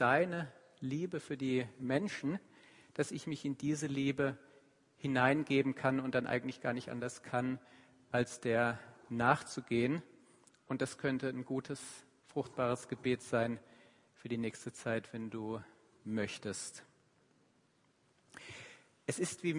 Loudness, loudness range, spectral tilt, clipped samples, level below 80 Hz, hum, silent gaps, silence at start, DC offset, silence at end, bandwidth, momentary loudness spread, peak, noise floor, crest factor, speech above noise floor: -37 LUFS; 8 LU; -5.5 dB/octave; under 0.1%; -74 dBFS; none; none; 0 s; under 0.1%; 0 s; 11 kHz; 14 LU; -14 dBFS; -73 dBFS; 24 dB; 37 dB